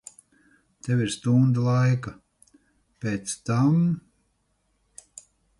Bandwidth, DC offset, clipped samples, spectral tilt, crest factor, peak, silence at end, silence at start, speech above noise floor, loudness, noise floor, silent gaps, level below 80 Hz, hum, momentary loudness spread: 11.5 kHz; under 0.1%; under 0.1%; -6.5 dB/octave; 16 dB; -10 dBFS; 1.6 s; 0.85 s; 48 dB; -24 LUFS; -71 dBFS; none; -60 dBFS; none; 18 LU